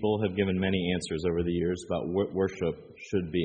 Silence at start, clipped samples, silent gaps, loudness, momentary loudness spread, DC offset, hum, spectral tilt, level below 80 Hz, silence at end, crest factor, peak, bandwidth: 0 s; under 0.1%; none; -30 LUFS; 6 LU; under 0.1%; none; -6.5 dB/octave; -52 dBFS; 0 s; 16 dB; -14 dBFS; 8.4 kHz